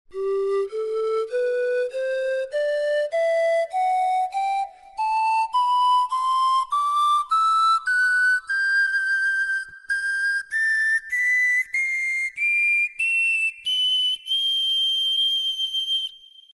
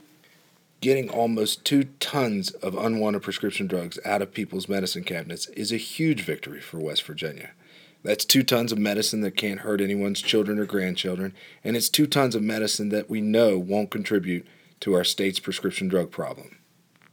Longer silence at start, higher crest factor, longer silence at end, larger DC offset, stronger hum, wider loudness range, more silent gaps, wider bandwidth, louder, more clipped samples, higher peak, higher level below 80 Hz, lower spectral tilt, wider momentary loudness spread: second, 0.1 s vs 0.8 s; second, 10 dB vs 24 dB; second, 0.4 s vs 0.65 s; neither; neither; about the same, 4 LU vs 5 LU; neither; second, 11.5 kHz vs over 20 kHz; first, -21 LUFS vs -25 LUFS; neither; second, -12 dBFS vs -2 dBFS; first, -66 dBFS vs -74 dBFS; second, 1.5 dB/octave vs -4 dB/octave; second, 7 LU vs 12 LU